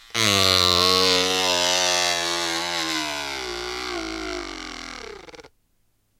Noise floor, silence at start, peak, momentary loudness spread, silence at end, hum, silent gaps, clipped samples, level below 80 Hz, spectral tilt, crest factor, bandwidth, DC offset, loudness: -66 dBFS; 0.15 s; -4 dBFS; 18 LU; 0.75 s; none; none; under 0.1%; -52 dBFS; -1.5 dB/octave; 20 dB; 17 kHz; under 0.1%; -20 LUFS